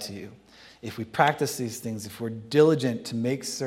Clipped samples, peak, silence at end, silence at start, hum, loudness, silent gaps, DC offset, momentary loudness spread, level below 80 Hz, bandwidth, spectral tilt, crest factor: under 0.1%; -4 dBFS; 0 s; 0 s; none; -26 LUFS; none; under 0.1%; 18 LU; -68 dBFS; 16.5 kHz; -5 dB/octave; 24 dB